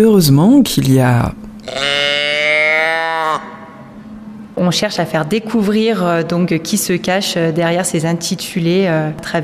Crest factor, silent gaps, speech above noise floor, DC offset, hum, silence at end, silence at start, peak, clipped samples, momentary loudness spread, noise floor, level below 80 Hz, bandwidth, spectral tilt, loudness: 14 dB; none; 20 dB; under 0.1%; none; 0 s; 0 s; 0 dBFS; under 0.1%; 15 LU; -34 dBFS; -42 dBFS; 15.5 kHz; -5 dB/octave; -14 LUFS